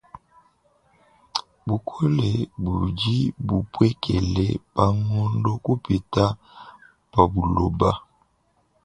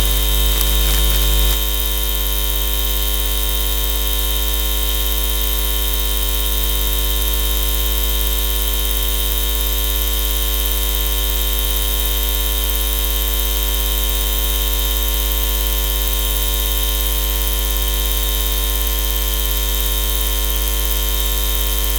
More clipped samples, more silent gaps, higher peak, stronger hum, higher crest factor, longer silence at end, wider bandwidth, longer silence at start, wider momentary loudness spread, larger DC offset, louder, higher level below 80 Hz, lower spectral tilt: neither; neither; about the same, 0 dBFS vs 0 dBFS; second, none vs 50 Hz at -20 dBFS; first, 24 dB vs 16 dB; first, 0.85 s vs 0 s; second, 9.8 kHz vs over 20 kHz; first, 1.35 s vs 0 s; first, 8 LU vs 2 LU; neither; second, -23 LUFS vs -17 LUFS; second, -38 dBFS vs -20 dBFS; first, -7.5 dB/octave vs -2.5 dB/octave